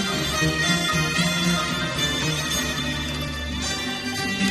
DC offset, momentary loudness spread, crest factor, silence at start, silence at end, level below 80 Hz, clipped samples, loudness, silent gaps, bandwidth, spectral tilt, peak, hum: under 0.1%; 6 LU; 16 dB; 0 s; 0 s; -38 dBFS; under 0.1%; -23 LUFS; none; 13.5 kHz; -3 dB/octave; -8 dBFS; none